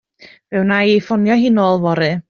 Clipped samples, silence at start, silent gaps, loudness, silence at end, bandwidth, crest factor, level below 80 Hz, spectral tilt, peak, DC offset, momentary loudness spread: under 0.1%; 0.5 s; none; -15 LUFS; 0.1 s; 6.8 kHz; 12 dB; -56 dBFS; -5 dB/octave; -2 dBFS; under 0.1%; 4 LU